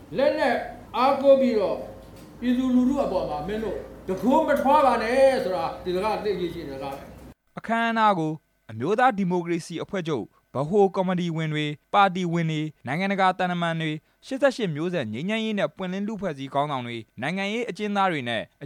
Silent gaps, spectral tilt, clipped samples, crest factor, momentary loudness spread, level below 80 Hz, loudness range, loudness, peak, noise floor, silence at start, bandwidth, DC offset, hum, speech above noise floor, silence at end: none; -6.5 dB/octave; under 0.1%; 18 dB; 13 LU; -54 dBFS; 4 LU; -24 LUFS; -6 dBFS; -44 dBFS; 0 s; 15.5 kHz; under 0.1%; none; 20 dB; 0 s